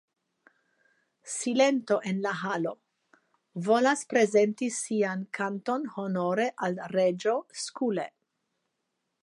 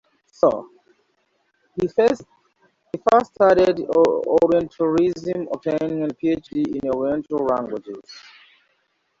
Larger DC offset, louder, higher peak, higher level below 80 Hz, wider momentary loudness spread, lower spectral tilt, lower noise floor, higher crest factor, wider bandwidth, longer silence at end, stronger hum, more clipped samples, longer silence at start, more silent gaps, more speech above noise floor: neither; second, -28 LUFS vs -20 LUFS; second, -10 dBFS vs -4 dBFS; second, -82 dBFS vs -56 dBFS; second, 11 LU vs 14 LU; second, -4.5 dB/octave vs -7 dB/octave; first, -81 dBFS vs -68 dBFS; about the same, 20 dB vs 18 dB; first, 11.5 kHz vs 7.6 kHz; first, 1.15 s vs 1 s; neither; neither; first, 1.25 s vs 0.45 s; neither; first, 53 dB vs 49 dB